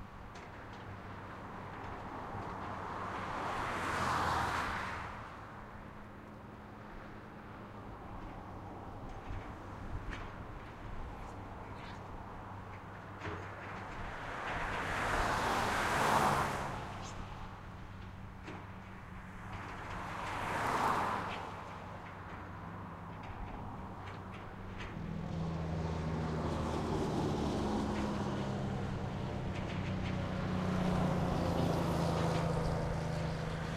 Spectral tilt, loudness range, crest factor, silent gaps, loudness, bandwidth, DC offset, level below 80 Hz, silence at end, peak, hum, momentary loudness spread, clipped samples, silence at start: -6 dB/octave; 12 LU; 20 dB; none; -38 LUFS; 16 kHz; under 0.1%; -50 dBFS; 0 s; -18 dBFS; none; 16 LU; under 0.1%; 0 s